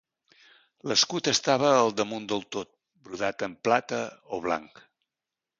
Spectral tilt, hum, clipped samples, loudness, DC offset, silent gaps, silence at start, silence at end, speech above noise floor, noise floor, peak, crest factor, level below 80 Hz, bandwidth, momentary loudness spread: -3 dB/octave; none; under 0.1%; -26 LUFS; under 0.1%; none; 0.85 s; 0.95 s; 62 dB; -89 dBFS; -6 dBFS; 22 dB; -68 dBFS; 10 kHz; 15 LU